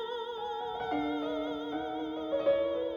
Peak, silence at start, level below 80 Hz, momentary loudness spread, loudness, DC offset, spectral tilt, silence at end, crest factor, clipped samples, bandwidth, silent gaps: -16 dBFS; 0 s; -62 dBFS; 8 LU; -34 LUFS; under 0.1%; -6 dB/octave; 0 s; 16 dB; under 0.1%; 6.8 kHz; none